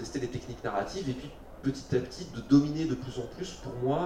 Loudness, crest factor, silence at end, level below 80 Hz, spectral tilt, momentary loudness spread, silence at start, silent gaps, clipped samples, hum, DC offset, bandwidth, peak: -32 LUFS; 20 dB; 0 s; -50 dBFS; -6.5 dB/octave; 15 LU; 0 s; none; under 0.1%; none; under 0.1%; 10.5 kHz; -12 dBFS